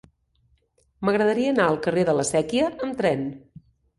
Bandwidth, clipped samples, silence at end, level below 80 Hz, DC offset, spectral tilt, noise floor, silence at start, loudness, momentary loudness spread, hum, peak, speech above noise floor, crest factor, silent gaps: 11.5 kHz; under 0.1%; 0.6 s; -56 dBFS; under 0.1%; -5 dB/octave; -65 dBFS; 1 s; -23 LUFS; 6 LU; none; -6 dBFS; 43 dB; 18 dB; none